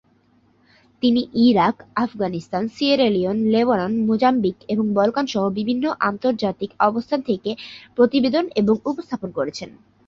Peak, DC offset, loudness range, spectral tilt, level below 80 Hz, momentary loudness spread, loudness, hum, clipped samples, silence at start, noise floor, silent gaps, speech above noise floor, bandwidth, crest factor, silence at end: -4 dBFS; under 0.1%; 2 LU; -6.5 dB/octave; -58 dBFS; 9 LU; -20 LUFS; none; under 0.1%; 1.05 s; -59 dBFS; none; 39 dB; 7.4 kHz; 16 dB; 0.4 s